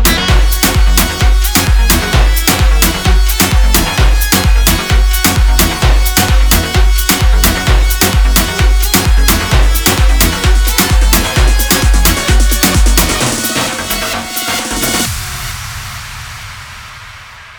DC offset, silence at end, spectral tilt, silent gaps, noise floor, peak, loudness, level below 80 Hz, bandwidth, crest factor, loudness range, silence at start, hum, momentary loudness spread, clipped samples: under 0.1%; 0.05 s; -3.5 dB/octave; none; -32 dBFS; 0 dBFS; -11 LUFS; -12 dBFS; over 20 kHz; 10 dB; 5 LU; 0 s; none; 11 LU; 0.2%